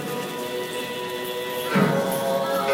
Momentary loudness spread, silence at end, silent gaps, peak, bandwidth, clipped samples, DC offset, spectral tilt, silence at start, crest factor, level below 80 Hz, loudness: 8 LU; 0 s; none; -8 dBFS; 16.5 kHz; under 0.1%; under 0.1%; -4.5 dB/octave; 0 s; 18 dB; -66 dBFS; -25 LUFS